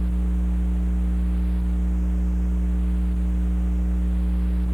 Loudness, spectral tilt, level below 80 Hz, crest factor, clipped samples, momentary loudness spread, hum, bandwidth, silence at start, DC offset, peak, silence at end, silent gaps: -25 LUFS; -9 dB/octave; -22 dBFS; 6 dB; under 0.1%; 0 LU; 60 Hz at -20 dBFS; 3.5 kHz; 0 s; under 0.1%; -16 dBFS; 0 s; none